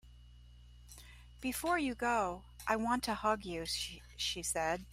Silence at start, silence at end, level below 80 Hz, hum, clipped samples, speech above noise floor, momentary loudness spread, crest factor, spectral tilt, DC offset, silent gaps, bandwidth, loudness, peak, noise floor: 0.05 s; 0 s; -56 dBFS; 60 Hz at -55 dBFS; under 0.1%; 21 dB; 21 LU; 20 dB; -3 dB/octave; under 0.1%; none; 16 kHz; -36 LUFS; -16 dBFS; -57 dBFS